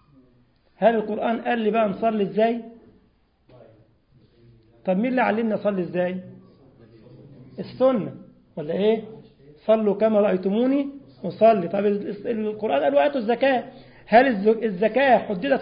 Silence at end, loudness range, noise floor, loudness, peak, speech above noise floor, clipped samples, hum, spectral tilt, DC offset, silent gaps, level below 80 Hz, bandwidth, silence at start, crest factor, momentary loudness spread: 0 s; 6 LU; -62 dBFS; -22 LUFS; -2 dBFS; 41 dB; under 0.1%; none; -11 dB/octave; under 0.1%; none; -62 dBFS; 5.2 kHz; 0.8 s; 20 dB; 15 LU